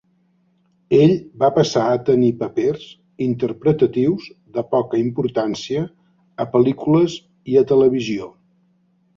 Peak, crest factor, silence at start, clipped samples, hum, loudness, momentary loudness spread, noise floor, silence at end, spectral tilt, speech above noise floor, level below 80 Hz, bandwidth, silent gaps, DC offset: -2 dBFS; 16 dB; 0.9 s; under 0.1%; none; -18 LUFS; 13 LU; -61 dBFS; 0.9 s; -7 dB/octave; 44 dB; -56 dBFS; 7.6 kHz; none; under 0.1%